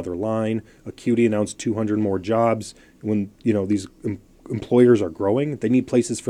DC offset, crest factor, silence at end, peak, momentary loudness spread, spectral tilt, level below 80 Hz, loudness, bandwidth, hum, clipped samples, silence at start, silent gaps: under 0.1%; 18 dB; 0 s; -4 dBFS; 14 LU; -6.5 dB/octave; -58 dBFS; -22 LUFS; 11.5 kHz; none; under 0.1%; 0 s; none